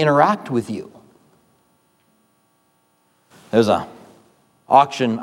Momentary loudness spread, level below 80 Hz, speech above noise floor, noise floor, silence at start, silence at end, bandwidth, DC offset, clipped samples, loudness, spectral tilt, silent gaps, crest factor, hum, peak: 16 LU; -64 dBFS; 46 dB; -63 dBFS; 0 s; 0 s; 16.5 kHz; under 0.1%; under 0.1%; -18 LUFS; -6 dB/octave; none; 20 dB; none; 0 dBFS